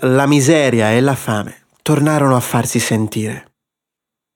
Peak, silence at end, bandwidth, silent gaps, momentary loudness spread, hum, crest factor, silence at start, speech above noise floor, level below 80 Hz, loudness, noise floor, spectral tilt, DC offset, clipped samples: -2 dBFS; 0.95 s; 18.5 kHz; none; 12 LU; none; 14 dB; 0 s; 69 dB; -54 dBFS; -15 LUFS; -83 dBFS; -5.5 dB/octave; under 0.1%; under 0.1%